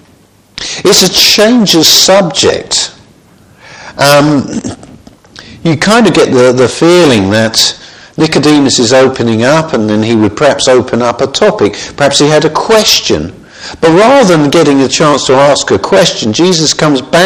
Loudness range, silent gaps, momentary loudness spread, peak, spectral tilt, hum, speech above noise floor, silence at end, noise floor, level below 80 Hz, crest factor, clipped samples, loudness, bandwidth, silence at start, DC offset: 3 LU; none; 9 LU; 0 dBFS; -3.5 dB/octave; none; 37 dB; 0 s; -43 dBFS; -40 dBFS; 8 dB; 2%; -7 LUFS; over 20 kHz; 0.55 s; 0.2%